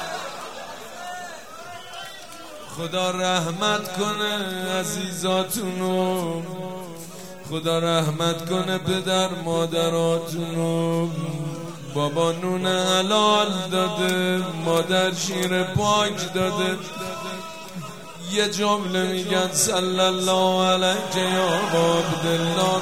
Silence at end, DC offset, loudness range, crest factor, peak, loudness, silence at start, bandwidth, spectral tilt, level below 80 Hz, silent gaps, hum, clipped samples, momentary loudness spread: 0 s; 0.5%; 5 LU; 18 dB; -6 dBFS; -22 LUFS; 0 s; 16.5 kHz; -4 dB/octave; -62 dBFS; none; none; under 0.1%; 16 LU